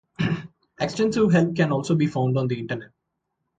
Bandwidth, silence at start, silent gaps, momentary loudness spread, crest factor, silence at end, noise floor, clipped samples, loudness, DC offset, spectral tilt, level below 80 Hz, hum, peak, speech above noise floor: 9 kHz; 0.2 s; none; 11 LU; 16 dB; 0.75 s; -78 dBFS; under 0.1%; -23 LUFS; under 0.1%; -7 dB/octave; -56 dBFS; none; -8 dBFS; 57 dB